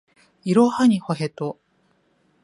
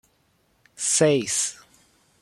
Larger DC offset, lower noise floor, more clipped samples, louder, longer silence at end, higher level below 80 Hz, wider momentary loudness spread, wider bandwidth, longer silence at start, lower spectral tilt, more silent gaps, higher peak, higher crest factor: neither; about the same, -64 dBFS vs -66 dBFS; neither; about the same, -21 LUFS vs -22 LUFS; first, 0.9 s vs 0.65 s; about the same, -68 dBFS vs -68 dBFS; first, 16 LU vs 9 LU; second, 11.5 kHz vs 13.5 kHz; second, 0.45 s vs 0.8 s; first, -7 dB/octave vs -3 dB/octave; neither; about the same, -4 dBFS vs -6 dBFS; about the same, 18 dB vs 20 dB